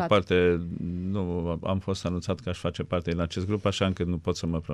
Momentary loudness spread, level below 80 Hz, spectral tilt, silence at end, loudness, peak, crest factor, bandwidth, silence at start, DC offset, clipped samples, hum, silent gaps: 8 LU; -50 dBFS; -6.5 dB/octave; 0 s; -28 LUFS; -10 dBFS; 18 dB; 11 kHz; 0 s; under 0.1%; under 0.1%; none; none